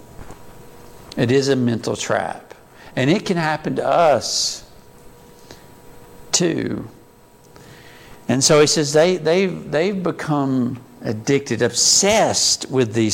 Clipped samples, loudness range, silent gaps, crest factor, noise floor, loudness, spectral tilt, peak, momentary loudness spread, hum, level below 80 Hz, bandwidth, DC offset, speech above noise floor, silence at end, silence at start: under 0.1%; 8 LU; none; 16 dB; -48 dBFS; -18 LUFS; -3.5 dB/octave; -2 dBFS; 15 LU; none; -52 dBFS; 17 kHz; under 0.1%; 30 dB; 0 s; 0 s